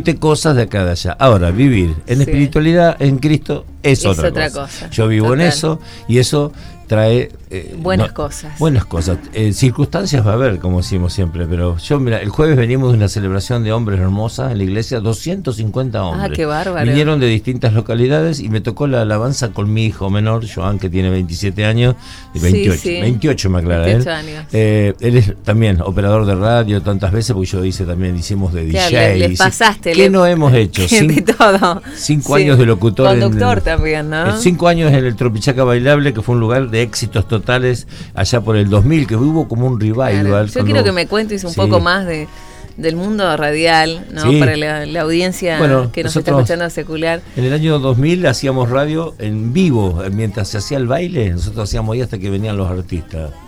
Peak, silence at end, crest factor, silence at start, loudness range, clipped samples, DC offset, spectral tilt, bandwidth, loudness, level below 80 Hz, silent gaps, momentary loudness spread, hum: 0 dBFS; 0 s; 14 dB; 0 s; 5 LU; under 0.1%; under 0.1%; -6 dB/octave; 15.5 kHz; -14 LUFS; -30 dBFS; none; 8 LU; none